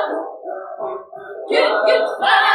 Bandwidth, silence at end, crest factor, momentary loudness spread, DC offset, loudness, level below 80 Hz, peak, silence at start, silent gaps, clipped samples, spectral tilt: 13.5 kHz; 0 s; 16 dB; 17 LU; under 0.1%; -18 LUFS; -76 dBFS; -2 dBFS; 0 s; none; under 0.1%; -2 dB/octave